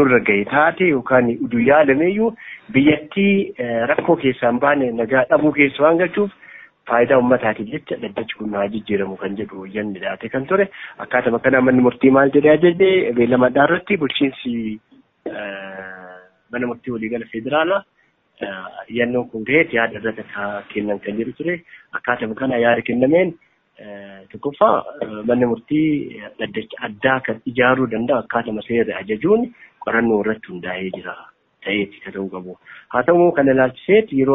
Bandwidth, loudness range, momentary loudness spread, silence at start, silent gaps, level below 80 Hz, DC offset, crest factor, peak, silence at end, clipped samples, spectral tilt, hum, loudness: 4 kHz; 8 LU; 15 LU; 0 s; none; -54 dBFS; under 0.1%; 16 dB; -2 dBFS; 0 s; under 0.1%; -4.5 dB/octave; none; -18 LUFS